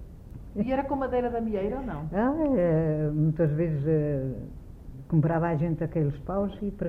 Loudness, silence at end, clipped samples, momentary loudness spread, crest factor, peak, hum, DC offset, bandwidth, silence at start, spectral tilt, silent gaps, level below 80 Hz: -27 LUFS; 0 s; under 0.1%; 15 LU; 16 dB; -12 dBFS; none; under 0.1%; 3.6 kHz; 0 s; -11 dB/octave; none; -44 dBFS